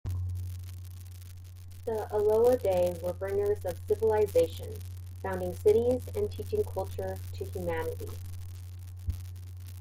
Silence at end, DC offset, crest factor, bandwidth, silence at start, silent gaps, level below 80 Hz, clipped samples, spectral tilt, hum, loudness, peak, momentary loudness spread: 0 s; under 0.1%; 18 dB; 16.5 kHz; 0.05 s; none; -52 dBFS; under 0.1%; -7 dB/octave; none; -31 LUFS; -14 dBFS; 19 LU